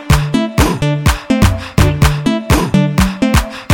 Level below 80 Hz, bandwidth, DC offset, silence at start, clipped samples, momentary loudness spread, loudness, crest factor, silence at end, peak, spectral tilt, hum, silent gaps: -20 dBFS; 17.5 kHz; 0.4%; 0 s; under 0.1%; 3 LU; -13 LUFS; 12 dB; 0 s; 0 dBFS; -5.5 dB/octave; none; none